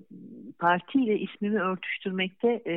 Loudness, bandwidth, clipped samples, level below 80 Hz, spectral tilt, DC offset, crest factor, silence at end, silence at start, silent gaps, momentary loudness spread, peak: -28 LUFS; 4.1 kHz; under 0.1%; -82 dBFS; -9 dB/octave; under 0.1%; 18 dB; 0 s; 0.1 s; none; 16 LU; -10 dBFS